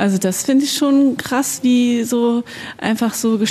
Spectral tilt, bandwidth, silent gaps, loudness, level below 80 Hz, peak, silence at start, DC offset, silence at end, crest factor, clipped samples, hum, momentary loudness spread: -4 dB/octave; 14 kHz; none; -17 LUFS; -60 dBFS; -4 dBFS; 0 s; under 0.1%; 0 s; 12 dB; under 0.1%; none; 7 LU